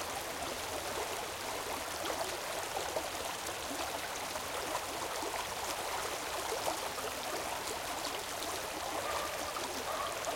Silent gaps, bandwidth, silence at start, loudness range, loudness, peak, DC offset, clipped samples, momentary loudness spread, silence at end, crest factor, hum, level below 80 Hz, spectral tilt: none; 17 kHz; 0 s; 1 LU; -37 LUFS; -20 dBFS; under 0.1%; under 0.1%; 2 LU; 0 s; 18 dB; none; -62 dBFS; -1.5 dB/octave